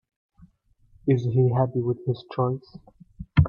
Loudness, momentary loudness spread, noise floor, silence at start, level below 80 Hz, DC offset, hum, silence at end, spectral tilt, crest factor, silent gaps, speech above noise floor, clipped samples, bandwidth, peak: -25 LUFS; 10 LU; -61 dBFS; 1.05 s; -44 dBFS; under 0.1%; none; 0 s; -10.5 dB/octave; 20 dB; none; 37 dB; under 0.1%; 5.4 kHz; -6 dBFS